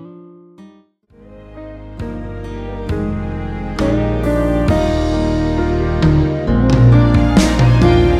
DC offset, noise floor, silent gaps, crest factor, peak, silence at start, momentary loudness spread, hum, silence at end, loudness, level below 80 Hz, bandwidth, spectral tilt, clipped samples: under 0.1%; -48 dBFS; none; 14 dB; 0 dBFS; 0 s; 17 LU; none; 0 s; -15 LUFS; -22 dBFS; 11.5 kHz; -7.5 dB/octave; under 0.1%